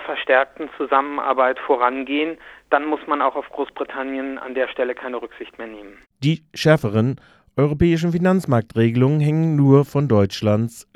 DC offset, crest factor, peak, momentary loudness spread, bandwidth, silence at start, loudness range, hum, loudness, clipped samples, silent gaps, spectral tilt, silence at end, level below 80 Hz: under 0.1%; 20 dB; 0 dBFS; 12 LU; 13 kHz; 0 s; 7 LU; none; -20 LUFS; under 0.1%; none; -7.5 dB/octave; 0.15 s; -48 dBFS